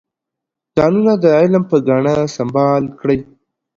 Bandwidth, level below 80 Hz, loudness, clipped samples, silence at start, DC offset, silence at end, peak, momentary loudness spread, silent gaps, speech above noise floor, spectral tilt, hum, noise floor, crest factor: 7.6 kHz; -50 dBFS; -14 LUFS; under 0.1%; 0.75 s; under 0.1%; 0.55 s; 0 dBFS; 7 LU; none; 69 dB; -7.5 dB/octave; none; -82 dBFS; 14 dB